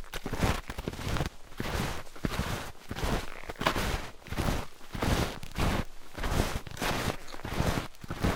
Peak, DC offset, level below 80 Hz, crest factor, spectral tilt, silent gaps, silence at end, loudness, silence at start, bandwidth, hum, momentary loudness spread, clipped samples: -8 dBFS; under 0.1%; -38 dBFS; 24 dB; -4.5 dB/octave; none; 0 s; -34 LUFS; 0 s; 18 kHz; none; 8 LU; under 0.1%